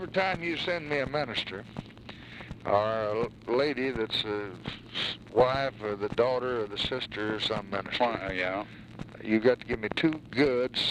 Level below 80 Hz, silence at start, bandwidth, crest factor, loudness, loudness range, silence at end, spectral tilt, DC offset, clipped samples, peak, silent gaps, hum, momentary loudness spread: -54 dBFS; 0 s; 12 kHz; 20 dB; -29 LUFS; 2 LU; 0 s; -5.5 dB/octave; under 0.1%; under 0.1%; -10 dBFS; none; none; 15 LU